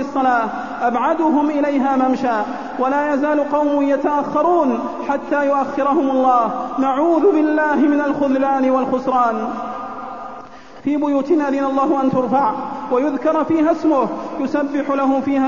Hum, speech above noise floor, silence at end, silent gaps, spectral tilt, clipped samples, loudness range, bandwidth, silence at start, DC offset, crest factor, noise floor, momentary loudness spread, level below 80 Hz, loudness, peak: none; 21 dB; 0 s; none; -6.5 dB/octave; under 0.1%; 3 LU; 7.2 kHz; 0 s; 0.7%; 14 dB; -37 dBFS; 8 LU; -56 dBFS; -17 LUFS; -4 dBFS